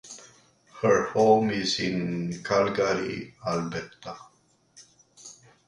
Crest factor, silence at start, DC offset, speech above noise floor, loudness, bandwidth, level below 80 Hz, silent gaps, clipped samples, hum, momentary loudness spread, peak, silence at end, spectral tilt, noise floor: 20 dB; 0.05 s; under 0.1%; 38 dB; -26 LUFS; 11 kHz; -60 dBFS; none; under 0.1%; none; 24 LU; -8 dBFS; 0.35 s; -5 dB/octave; -63 dBFS